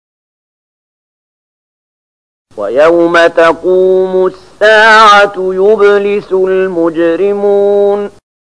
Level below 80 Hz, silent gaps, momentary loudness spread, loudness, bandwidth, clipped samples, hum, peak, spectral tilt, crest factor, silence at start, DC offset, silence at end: -50 dBFS; none; 9 LU; -8 LUFS; 10.5 kHz; 0.2%; none; 0 dBFS; -4.5 dB/octave; 10 dB; 2.55 s; 0.8%; 0.5 s